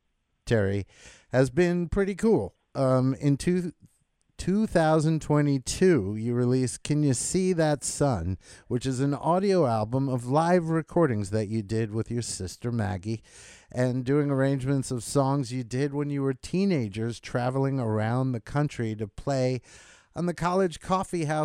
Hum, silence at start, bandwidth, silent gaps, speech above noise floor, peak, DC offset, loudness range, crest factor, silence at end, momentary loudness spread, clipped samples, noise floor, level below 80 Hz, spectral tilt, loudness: none; 0.45 s; 14 kHz; none; 44 dB; -8 dBFS; under 0.1%; 4 LU; 18 dB; 0 s; 9 LU; under 0.1%; -70 dBFS; -50 dBFS; -6.5 dB/octave; -27 LUFS